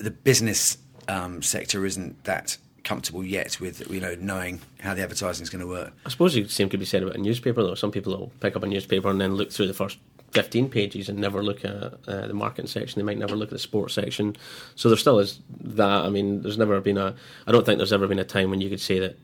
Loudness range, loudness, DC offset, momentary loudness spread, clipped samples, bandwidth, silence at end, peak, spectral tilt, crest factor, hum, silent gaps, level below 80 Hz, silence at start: 6 LU; -25 LUFS; under 0.1%; 12 LU; under 0.1%; 18.5 kHz; 0.05 s; -4 dBFS; -4.5 dB/octave; 22 dB; none; none; -60 dBFS; 0 s